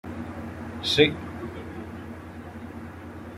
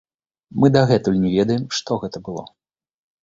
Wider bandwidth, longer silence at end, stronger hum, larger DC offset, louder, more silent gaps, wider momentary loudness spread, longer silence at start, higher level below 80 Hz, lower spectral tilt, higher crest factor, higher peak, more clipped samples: first, 15.5 kHz vs 7.8 kHz; second, 0 s vs 0.75 s; neither; neither; second, -27 LUFS vs -19 LUFS; neither; first, 19 LU vs 16 LU; second, 0.05 s vs 0.55 s; about the same, -54 dBFS vs -50 dBFS; second, -5 dB/octave vs -6.5 dB/octave; first, 26 dB vs 20 dB; second, -4 dBFS vs 0 dBFS; neither